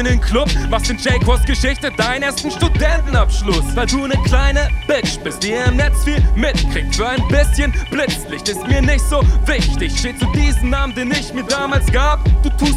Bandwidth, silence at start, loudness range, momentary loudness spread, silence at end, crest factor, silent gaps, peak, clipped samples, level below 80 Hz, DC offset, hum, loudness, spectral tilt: 14 kHz; 0 s; 0 LU; 4 LU; 0 s; 14 dB; none; 0 dBFS; under 0.1%; -16 dBFS; under 0.1%; none; -16 LUFS; -5 dB/octave